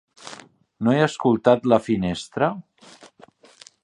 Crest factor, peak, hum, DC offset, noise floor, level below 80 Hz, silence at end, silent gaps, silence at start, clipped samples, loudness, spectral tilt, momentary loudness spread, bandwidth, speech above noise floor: 22 dB; -2 dBFS; none; under 0.1%; -52 dBFS; -54 dBFS; 1.2 s; none; 0.25 s; under 0.1%; -21 LUFS; -6.5 dB/octave; 21 LU; 11 kHz; 31 dB